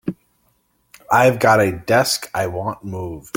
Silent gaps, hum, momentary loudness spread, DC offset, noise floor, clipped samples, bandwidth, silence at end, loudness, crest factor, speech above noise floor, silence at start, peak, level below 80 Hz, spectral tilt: none; none; 15 LU; under 0.1%; -63 dBFS; under 0.1%; 17 kHz; 0.15 s; -17 LUFS; 18 dB; 46 dB; 0.05 s; -2 dBFS; -52 dBFS; -4.5 dB/octave